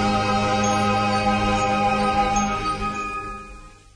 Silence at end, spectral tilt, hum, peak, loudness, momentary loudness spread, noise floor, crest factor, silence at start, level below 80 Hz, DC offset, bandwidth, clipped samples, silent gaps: 0.2 s; -4.5 dB/octave; none; -8 dBFS; -21 LUFS; 10 LU; -42 dBFS; 14 dB; 0 s; -38 dBFS; under 0.1%; 10.5 kHz; under 0.1%; none